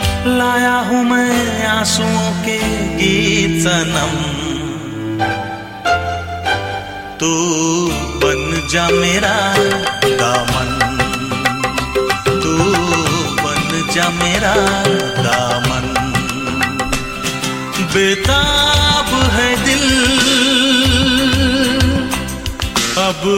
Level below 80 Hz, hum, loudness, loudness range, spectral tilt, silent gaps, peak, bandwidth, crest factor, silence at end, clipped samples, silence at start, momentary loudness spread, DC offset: -30 dBFS; none; -14 LUFS; 5 LU; -3.5 dB/octave; none; 0 dBFS; 16.5 kHz; 14 dB; 0 s; under 0.1%; 0 s; 8 LU; under 0.1%